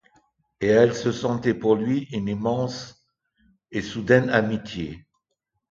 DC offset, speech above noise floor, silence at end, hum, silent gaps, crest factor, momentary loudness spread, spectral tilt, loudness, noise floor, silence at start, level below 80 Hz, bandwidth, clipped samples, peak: under 0.1%; 57 dB; 0.7 s; none; none; 22 dB; 14 LU; -6.5 dB/octave; -23 LUFS; -79 dBFS; 0.6 s; -54 dBFS; 7.6 kHz; under 0.1%; -2 dBFS